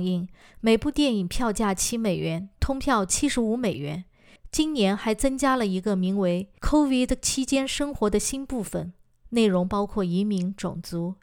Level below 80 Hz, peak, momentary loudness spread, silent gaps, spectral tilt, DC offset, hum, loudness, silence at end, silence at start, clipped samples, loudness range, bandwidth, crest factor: -40 dBFS; -10 dBFS; 9 LU; none; -4.5 dB/octave; under 0.1%; none; -25 LUFS; 0.1 s; 0 s; under 0.1%; 2 LU; 18.5 kHz; 16 dB